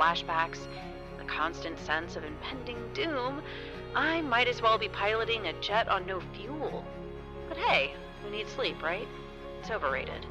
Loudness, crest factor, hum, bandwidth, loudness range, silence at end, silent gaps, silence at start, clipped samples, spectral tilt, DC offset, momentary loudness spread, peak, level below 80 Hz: -31 LUFS; 20 dB; none; 12.5 kHz; 5 LU; 0 s; none; 0 s; under 0.1%; -4.5 dB/octave; under 0.1%; 15 LU; -12 dBFS; -50 dBFS